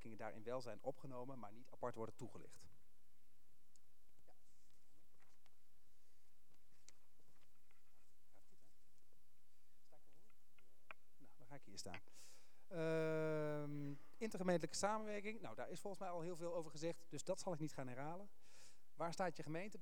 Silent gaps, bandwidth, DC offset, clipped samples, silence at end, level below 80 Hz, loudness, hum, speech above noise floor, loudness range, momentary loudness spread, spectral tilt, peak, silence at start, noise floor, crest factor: none; 19.5 kHz; 0.4%; under 0.1%; 0 s; -84 dBFS; -48 LUFS; none; 33 dB; 17 LU; 21 LU; -5 dB/octave; -26 dBFS; 0.05 s; -81 dBFS; 24 dB